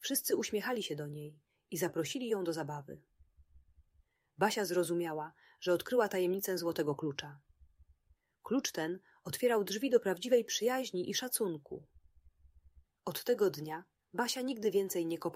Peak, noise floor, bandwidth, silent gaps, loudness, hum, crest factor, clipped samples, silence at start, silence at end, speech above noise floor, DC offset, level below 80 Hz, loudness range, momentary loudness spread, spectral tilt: -14 dBFS; -73 dBFS; 16 kHz; none; -35 LUFS; none; 22 dB; under 0.1%; 0 s; 0 s; 38 dB; under 0.1%; -72 dBFS; 5 LU; 14 LU; -4 dB/octave